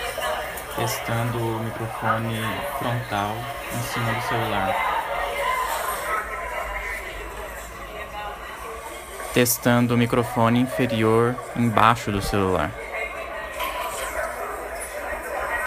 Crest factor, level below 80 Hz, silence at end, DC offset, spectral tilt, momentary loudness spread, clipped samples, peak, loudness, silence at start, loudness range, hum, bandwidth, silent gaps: 24 dB; -44 dBFS; 0 s; under 0.1%; -5 dB/octave; 14 LU; under 0.1%; 0 dBFS; -24 LUFS; 0 s; 8 LU; none; 15.5 kHz; none